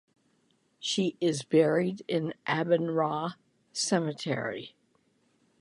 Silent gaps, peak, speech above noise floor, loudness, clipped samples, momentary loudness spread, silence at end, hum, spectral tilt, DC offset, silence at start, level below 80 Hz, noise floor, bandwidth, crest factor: none; -12 dBFS; 42 dB; -29 LUFS; under 0.1%; 12 LU; 0.95 s; none; -4.5 dB/octave; under 0.1%; 0.8 s; -76 dBFS; -70 dBFS; 11.5 kHz; 20 dB